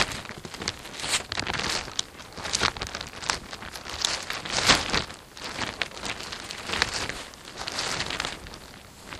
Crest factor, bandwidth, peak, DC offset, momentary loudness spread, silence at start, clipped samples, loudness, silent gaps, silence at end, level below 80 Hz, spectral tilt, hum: 30 dB; 16 kHz; -2 dBFS; under 0.1%; 13 LU; 0 s; under 0.1%; -28 LUFS; none; 0 s; -48 dBFS; -1.5 dB/octave; none